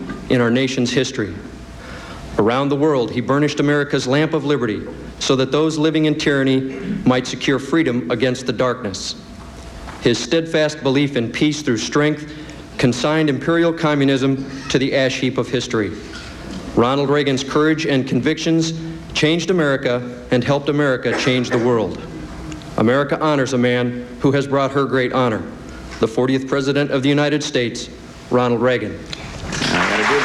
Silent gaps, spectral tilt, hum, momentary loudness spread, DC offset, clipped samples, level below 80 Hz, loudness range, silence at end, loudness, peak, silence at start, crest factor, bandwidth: none; -5.5 dB/octave; none; 14 LU; under 0.1%; under 0.1%; -44 dBFS; 2 LU; 0 s; -18 LUFS; -2 dBFS; 0 s; 16 dB; 12 kHz